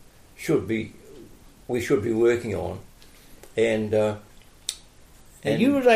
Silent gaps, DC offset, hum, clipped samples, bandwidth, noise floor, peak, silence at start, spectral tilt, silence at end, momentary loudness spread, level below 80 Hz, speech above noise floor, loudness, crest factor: none; under 0.1%; none; under 0.1%; 15 kHz; -50 dBFS; -6 dBFS; 0.4 s; -5.5 dB/octave; 0 s; 16 LU; -54 dBFS; 28 dB; -25 LUFS; 18 dB